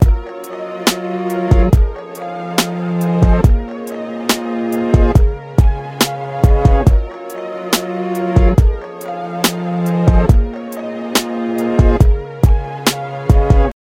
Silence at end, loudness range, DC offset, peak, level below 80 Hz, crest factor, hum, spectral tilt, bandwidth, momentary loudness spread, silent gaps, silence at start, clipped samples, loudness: 0.1 s; 2 LU; under 0.1%; 0 dBFS; -16 dBFS; 14 dB; none; -6 dB/octave; 16.5 kHz; 13 LU; none; 0 s; under 0.1%; -16 LUFS